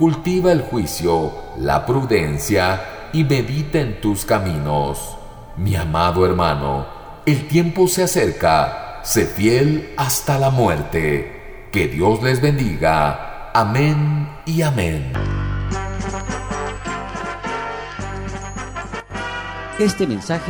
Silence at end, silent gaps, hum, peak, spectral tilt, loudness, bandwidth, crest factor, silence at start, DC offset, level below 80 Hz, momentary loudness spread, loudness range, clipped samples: 0 s; none; none; -4 dBFS; -5.5 dB/octave; -19 LUFS; over 20 kHz; 16 dB; 0 s; under 0.1%; -34 dBFS; 12 LU; 8 LU; under 0.1%